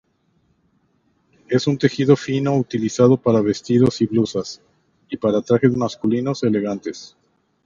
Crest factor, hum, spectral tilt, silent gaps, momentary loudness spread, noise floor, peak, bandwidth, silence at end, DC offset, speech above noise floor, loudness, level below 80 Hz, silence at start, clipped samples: 20 dB; none; -7 dB/octave; none; 12 LU; -64 dBFS; 0 dBFS; 7.6 kHz; 0.6 s; under 0.1%; 46 dB; -19 LUFS; -56 dBFS; 1.5 s; under 0.1%